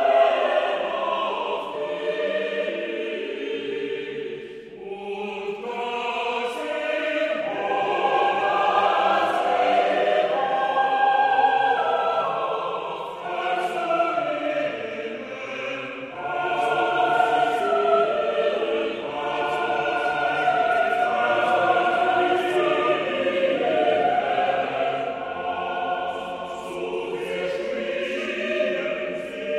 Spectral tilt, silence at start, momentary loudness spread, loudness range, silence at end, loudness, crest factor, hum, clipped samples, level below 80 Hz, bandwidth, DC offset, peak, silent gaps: -4.5 dB/octave; 0 s; 10 LU; 7 LU; 0 s; -23 LUFS; 18 dB; none; under 0.1%; -64 dBFS; 11.5 kHz; under 0.1%; -6 dBFS; none